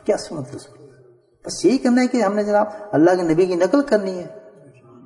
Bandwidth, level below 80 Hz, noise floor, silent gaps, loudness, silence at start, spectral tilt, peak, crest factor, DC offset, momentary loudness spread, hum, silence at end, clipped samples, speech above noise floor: 11 kHz; -58 dBFS; -52 dBFS; none; -18 LUFS; 0.05 s; -5.5 dB/octave; -2 dBFS; 18 dB; under 0.1%; 17 LU; none; 0.55 s; under 0.1%; 33 dB